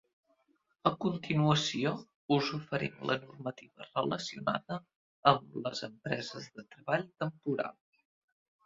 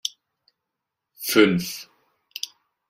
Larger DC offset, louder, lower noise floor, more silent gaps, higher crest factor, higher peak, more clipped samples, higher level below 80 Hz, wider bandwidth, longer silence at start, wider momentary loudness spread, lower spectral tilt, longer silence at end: neither; second, -34 LUFS vs -23 LUFS; second, -75 dBFS vs -83 dBFS; first, 2.16-2.29 s, 4.96-5.23 s vs none; about the same, 26 dB vs 22 dB; second, -8 dBFS vs -4 dBFS; neither; second, -70 dBFS vs -64 dBFS; second, 7.8 kHz vs 16 kHz; first, 0.85 s vs 0.05 s; second, 14 LU vs 18 LU; first, -5.5 dB/octave vs -4 dB/octave; first, 0.95 s vs 0.45 s